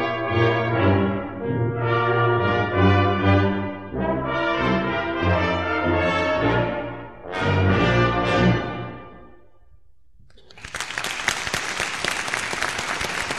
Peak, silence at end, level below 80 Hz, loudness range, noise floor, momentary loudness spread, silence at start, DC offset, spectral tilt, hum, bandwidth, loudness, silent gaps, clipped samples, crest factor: -4 dBFS; 0 s; -42 dBFS; 6 LU; -56 dBFS; 10 LU; 0 s; 0.4%; -5.5 dB/octave; none; 13.5 kHz; -22 LUFS; none; under 0.1%; 18 dB